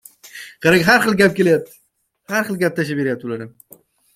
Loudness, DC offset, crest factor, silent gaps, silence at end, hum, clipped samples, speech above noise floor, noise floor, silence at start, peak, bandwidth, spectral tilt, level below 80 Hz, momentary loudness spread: -17 LUFS; under 0.1%; 18 dB; none; 0.65 s; none; under 0.1%; 31 dB; -48 dBFS; 0.25 s; 0 dBFS; 16 kHz; -5 dB/octave; -56 dBFS; 23 LU